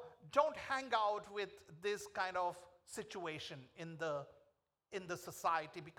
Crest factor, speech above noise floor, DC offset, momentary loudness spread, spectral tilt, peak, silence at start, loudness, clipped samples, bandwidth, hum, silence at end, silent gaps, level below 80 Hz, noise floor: 24 dB; 37 dB; under 0.1%; 14 LU; -3.5 dB/octave; -18 dBFS; 0 s; -41 LUFS; under 0.1%; 18.5 kHz; none; 0.05 s; none; -78 dBFS; -78 dBFS